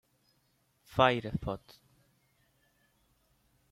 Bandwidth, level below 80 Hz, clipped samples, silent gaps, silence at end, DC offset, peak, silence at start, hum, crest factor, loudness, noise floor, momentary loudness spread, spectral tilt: 15.5 kHz; -60 dBFS; under 0.1%; none; 2.15 s; under 0.1%; -8 dBFS; 0.9 s; none; 28 dB; -31 LUFS; -73 dBFS; 14 LU; -6.5 dB/octave